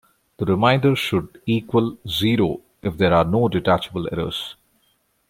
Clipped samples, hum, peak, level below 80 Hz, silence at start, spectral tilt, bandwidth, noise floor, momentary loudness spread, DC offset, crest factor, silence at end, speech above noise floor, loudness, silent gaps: under 0.1%; none; -2 dBFS; -48 dBFS; 0.4 s; -6.5 dB/octave; 16.5 kHz; -65 dBFS; 11 LU; under 0.1%; 18 dB; 0.75 s; 45 dB; -21 LUFS; none